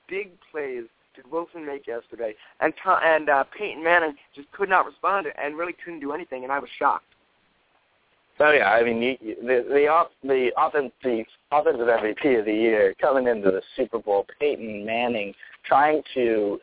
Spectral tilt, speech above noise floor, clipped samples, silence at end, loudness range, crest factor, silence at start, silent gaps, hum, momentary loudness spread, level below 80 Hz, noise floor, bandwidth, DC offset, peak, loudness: -8 dB/octave; 42 dB; under 0.1%; 0.05 s; 5 LU; 18 dB; 0.1 s; none; none; 13 LU; -64 dBFS; -65 dBFS; 4 kHz; under 0.1%; -6 dBFS; -23 LUFS